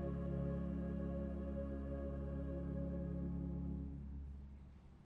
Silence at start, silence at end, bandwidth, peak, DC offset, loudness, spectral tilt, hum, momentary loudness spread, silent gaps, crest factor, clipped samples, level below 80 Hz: 0 s; 0 s; 3.5 kHz; -32 dBFS; under 0.1%; -45 LUFS; -11 dB/octave; none; 10 LU; none; 12 dB; under 0.1%; -48 dBFS